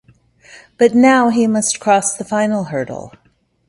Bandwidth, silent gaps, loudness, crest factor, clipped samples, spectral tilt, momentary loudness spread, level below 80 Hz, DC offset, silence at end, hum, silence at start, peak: 11.5 kHz; none; -14 LUFS; 16 dB; under 0.1%; -4 dB/octave; 12 LU; -58 dBFS; under 0.1%; 0.6 s; none; 0.8 s; 0 dBFS